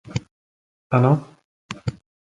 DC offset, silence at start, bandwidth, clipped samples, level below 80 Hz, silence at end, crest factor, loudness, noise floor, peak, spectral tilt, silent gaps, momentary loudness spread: under 0.1%; 0.1 s; 7.8 kHz; under 0.1%; -50 dBFS; 0.35 s; 22 dB; -23 LUFS; under -90 dBFS; -2 dBFS; -8 dB/octave; 0.31-0.90 s, 1.45-1.69 s; 14 LU